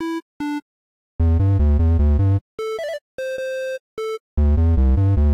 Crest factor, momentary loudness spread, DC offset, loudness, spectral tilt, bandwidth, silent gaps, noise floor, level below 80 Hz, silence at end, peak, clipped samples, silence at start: 6 dB; 11 LU; under 0.1%; -21 LUFS; -8.5 dB/octave; 7.2 kHz; 0.22-0.40 s, 0.62-1.19 s, 2.41-2.58 s, 3.01-3.18 s, 3.80-3.97 s, 4.20-4.37 s; under -90 dBFS; -22 dBFS; 0 s; -12 dBFS; under 0.1%; 0 s